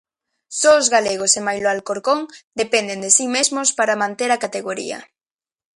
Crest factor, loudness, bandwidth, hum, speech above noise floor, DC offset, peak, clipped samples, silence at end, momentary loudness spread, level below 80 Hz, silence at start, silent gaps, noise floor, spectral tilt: 20 dB; -18 LUFS; 11.5 kHz; none; over 71 dB; under 0.1%; 0 dBFS; under 0.1%; 0.75 s; 13 LU; -64 dBFS; 0.5 s; 2.44-2.51 s; under -90 dBFS; -1 dB/octave